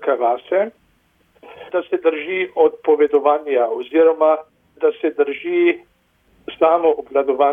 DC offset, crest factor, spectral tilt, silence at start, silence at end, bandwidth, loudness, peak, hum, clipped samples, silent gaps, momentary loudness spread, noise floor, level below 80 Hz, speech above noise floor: under 0.1%; 16 dB; -7 dB/octave; 0 s; 0 s; 3.7 kHz; -18 LUFS; -2 dBFS; none; under 0.1%; none; 8 LU; -60 dBFS; -64 dBFS; 43 dB